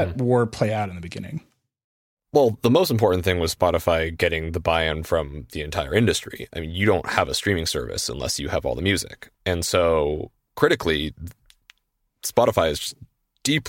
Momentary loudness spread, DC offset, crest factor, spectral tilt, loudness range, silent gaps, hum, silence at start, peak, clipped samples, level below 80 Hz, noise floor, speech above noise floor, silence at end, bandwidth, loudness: 13 LU; under 0.1%; 20 dB; -4.5 dB/octave; 3 LU; 1.84-2.17 s; none; 0 s; -2 dBFS; under 0.1%; -42 dBFS; -73 dBFS; 51 dB; 0 s; 17 kHz; -22 LUFS